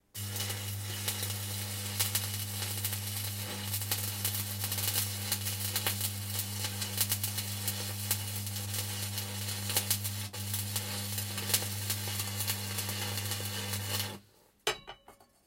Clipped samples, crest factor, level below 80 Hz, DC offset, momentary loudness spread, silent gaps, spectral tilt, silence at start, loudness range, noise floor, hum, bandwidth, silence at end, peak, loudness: under 0.1%; 26 dB; -68 dBFS; under 0.1%; 6 LU; none; -2.5 dB/octave; 0.15 s; 2 LU; -61 dBFS; none; 17 kHz; 0.25 s; -10 dBFS; -33 LUFS